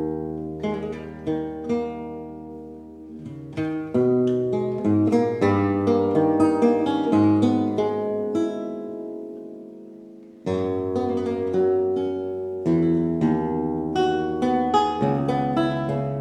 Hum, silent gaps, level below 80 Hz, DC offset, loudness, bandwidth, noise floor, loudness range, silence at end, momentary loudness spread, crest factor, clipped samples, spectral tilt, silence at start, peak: none; none; -54 dBFS; under 0.1%; -23 LUFS; 9.4 kHz; -44 dBFS; 8 LU; 0 s; 17 LU; 16 dB; under 0.1%; -8 dB/octave; 0 s; -6 dBFS